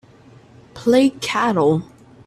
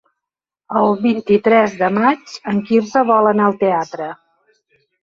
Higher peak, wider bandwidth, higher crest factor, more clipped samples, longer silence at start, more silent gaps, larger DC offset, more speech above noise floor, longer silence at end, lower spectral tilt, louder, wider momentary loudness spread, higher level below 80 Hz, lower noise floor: about the same, -2 dBFS vs -2 dBFS; first, 13.5 kHz vs 7.4 kHz; about the same, 18 dB vs 14 dB; neither; about the same, 0.75 s vs 0.7 s; neither; neither; second, 30 dB vs 69 dB; second, 0.45 s vs 0.9 s; about the same, -5.5 dB/octave vs -6.5 dB/octave; about the same, -18 LUFS vs -16 LUFS; about the same, 8 LU vs 10 LU; about the same, -56 dBFS vs -60 dBFS; second, -47 dBFS vs -84 dBFS